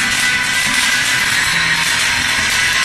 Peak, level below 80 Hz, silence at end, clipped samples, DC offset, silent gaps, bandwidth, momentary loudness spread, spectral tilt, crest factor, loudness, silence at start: -2 dBFS; -40 dBFS; 0 s; under 0.1%; under 0.1%; none; 14 kHz; 1 LU; 0 dB/octave; 14 dB; -13 LUFS; 0 s